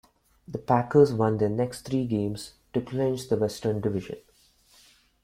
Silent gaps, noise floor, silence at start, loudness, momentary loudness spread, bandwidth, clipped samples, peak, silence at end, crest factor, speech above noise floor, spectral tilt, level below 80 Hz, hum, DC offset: none; -61 dBFS; 0.5 s; -26 LUFS; 17 LU; 15.5 kHz; under 0.1%; -8 dBFS; 1.05 s; 20 dB; 36 dB; -7 dB/octave; -58 dBFS; none; under 0.1%